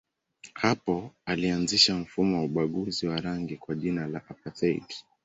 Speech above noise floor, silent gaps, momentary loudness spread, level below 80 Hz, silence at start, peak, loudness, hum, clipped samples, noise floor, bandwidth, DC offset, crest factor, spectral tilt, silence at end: 26 dB; none; 14 LU; -58 dBFS; 0.45 s; -8 dBFS; -28 LUFS; none; under 0.1%; -54 dBFS; 8.4 kHz; under 0.1%; 22 dB; -4.5 dB/octave; 0.25 s